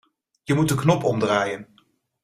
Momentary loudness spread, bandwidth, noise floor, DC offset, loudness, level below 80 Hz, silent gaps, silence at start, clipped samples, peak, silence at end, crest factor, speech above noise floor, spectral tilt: 13 LU; 15.5 kHz; -63 dBFS; under 0.1%; -22 LUFS; -56 dBFS; none; 0.5 s; under 0.1%; -4 dBFS; 0.6 s; 20 dB; 42 dB; -6 dB/octave